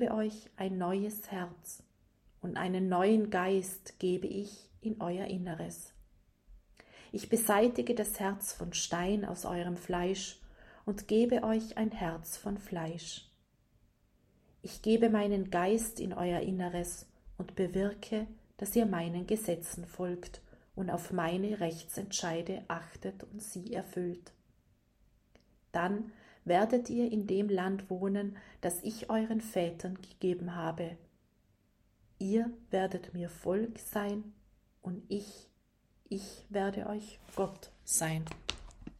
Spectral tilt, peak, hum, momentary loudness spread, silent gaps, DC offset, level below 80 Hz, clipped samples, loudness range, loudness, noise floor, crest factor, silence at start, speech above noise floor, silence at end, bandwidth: -5 dB/octave; -12 dBFS; none; 14 LU; none; under 0.1%; -60 dBFS; under 0.1%; 7 LU; -35 LUFS; -71 dBFS; 24 dB; 0 s; 37 dB; 0 s; 15.5 kHz